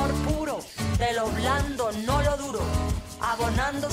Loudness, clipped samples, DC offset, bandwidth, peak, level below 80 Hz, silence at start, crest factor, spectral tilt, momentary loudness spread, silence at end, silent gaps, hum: -27 LUFS; under 0.1%; under 0.1%; 16 kHz; -12 dBFS; -34 dBFS; 0 s; 14 dB; -5 dB/octave; 5 LU; 0 s; none; none